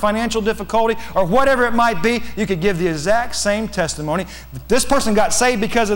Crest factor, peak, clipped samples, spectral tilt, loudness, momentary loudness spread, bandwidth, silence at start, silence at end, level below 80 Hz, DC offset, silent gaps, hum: 12 dB; -6 dBFS; under 0.1%; -4 dB/octave; -18 LUFS; 7 LU; 18 kHz; 0 s; 0 s; -36 dBFS; under 0.1%; none; none